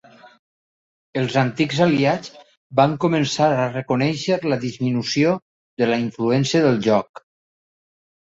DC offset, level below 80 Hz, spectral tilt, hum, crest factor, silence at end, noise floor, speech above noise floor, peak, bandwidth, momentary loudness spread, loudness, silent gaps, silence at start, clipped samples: under 0.1%; -60 dBFS; -6 dB/octave; none; 18 dB; 1.25 s; under -90 dBFS; over 71 dB; -2 dBFS; 8 kHz; 8 LU; -20 LUFS; 2.57-2.70 s, 5.42-5.77 s; 1.15 s; under 0.1%